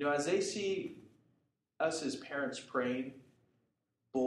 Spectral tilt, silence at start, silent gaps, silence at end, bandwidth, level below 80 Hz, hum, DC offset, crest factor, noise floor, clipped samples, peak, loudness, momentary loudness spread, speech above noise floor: -4 dB/octave; 0 s; none; 0 s; 12 kHz; -80 dBFS; none; under 0.1%; 18 dB; -82 dBFS; under 0.1%; -20 dBFS; -37 LUFS; 10 LU; 46 dB